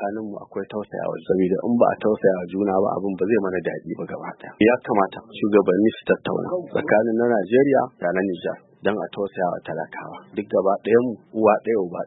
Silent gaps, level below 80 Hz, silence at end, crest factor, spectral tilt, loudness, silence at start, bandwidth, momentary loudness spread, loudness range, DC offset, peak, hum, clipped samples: none; -62 dBFS; 0 s; 18 dB; -11.5 dB/octave; -22 LUFS; 0 s; 4 kHz; 13 LU; 3 LU; under 0.1%; -4 dBFS; none; under 0.1%